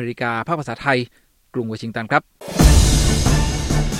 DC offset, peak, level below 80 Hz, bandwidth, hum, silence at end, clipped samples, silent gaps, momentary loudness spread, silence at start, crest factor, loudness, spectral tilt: under 0.1%; 0 dBFS; -22 dBFS; 16.5 kHz; none; 0 s; under 0.1%; none; 13 LU; 0 s; 18 dB; -19 LUFS; -4.5 dB/octave